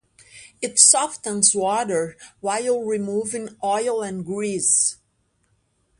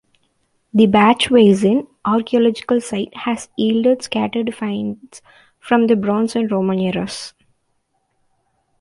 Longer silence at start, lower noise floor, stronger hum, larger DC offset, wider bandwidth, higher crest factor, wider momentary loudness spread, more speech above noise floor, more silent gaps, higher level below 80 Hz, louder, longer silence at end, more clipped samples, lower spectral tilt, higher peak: second, 0.35 s vs 0.75 s; about the same, -68 dBFS vs -67 dBFS; neither; neither; about the same, 11.5 kHz vs 11.5 kHz; first, 22 dB vs 16 dB; first, 15 LU vs 12 LU; second, 46 dB vs 51 dB; neither; second, -66 dBFS vs -56 dBFS; about the same, -19 LUFS vs -17 LUFS; second, 1.05 s vs 1.5 s; neither; second, -2 dB/octave vs -6 dB/octave; about the same, 0 dBFS vs -2 dBFS